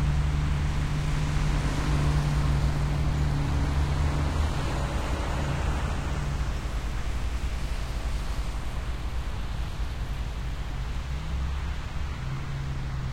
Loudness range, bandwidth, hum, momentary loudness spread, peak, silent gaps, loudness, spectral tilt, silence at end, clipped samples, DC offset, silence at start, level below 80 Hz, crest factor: 7 LU; 14.5 kHz; none; 8 LU; -12 dBFS; none; -30 LUFS; -6 dB/octave; 0 s; under 0.1%; under 0.1%; 0 s; -30 dBFS; 14 dB